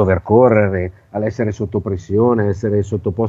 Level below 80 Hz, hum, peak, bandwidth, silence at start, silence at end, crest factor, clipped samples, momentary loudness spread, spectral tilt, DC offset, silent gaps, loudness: -42 dBFS; none; 0 dBFS; 7.6 kHz; 0 s; 0 s; 16 dB; under 0.1%; 11 LU; -9.5 dB/octave; under 0.1%; none; -17 LUFS